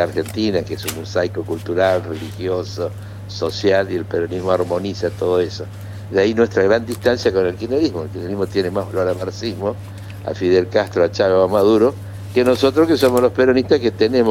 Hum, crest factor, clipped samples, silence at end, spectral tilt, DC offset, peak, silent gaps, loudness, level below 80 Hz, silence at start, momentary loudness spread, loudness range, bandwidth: none; 18 dB; under 0.1%; 0 s; -6 dB/octave; under 0.1%; 0 dBFS; none; -18 LUFS; -48 dBFS; 0 s; 12 LU; 6 LU; 16.5 kHz